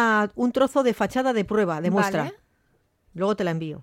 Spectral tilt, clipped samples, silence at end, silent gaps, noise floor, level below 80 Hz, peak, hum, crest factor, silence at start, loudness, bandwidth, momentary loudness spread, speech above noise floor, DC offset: -6 dB/octave; under 0.1%; 0 s; none; -67 dBFS; -58 dBFS; -8 dBFS; none; 16 dB; 0 s; -24 LUFS; 16 kHz; 7 LU; 44 dB; under 0.1%